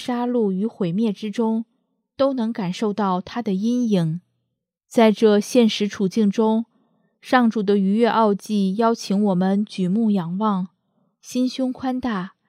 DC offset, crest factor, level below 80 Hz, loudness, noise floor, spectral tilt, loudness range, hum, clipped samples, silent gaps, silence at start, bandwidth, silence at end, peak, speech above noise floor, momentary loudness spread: under 0.1%; 18 dB; -66 dBFS; -21 LUFS; -77 dBFS; -6.5 dB/octave; 4 LU; none; under 0.1%; none; 0 s; 14 kHz; 0.2 s; -2 dBFS; 58 dB; 8 LU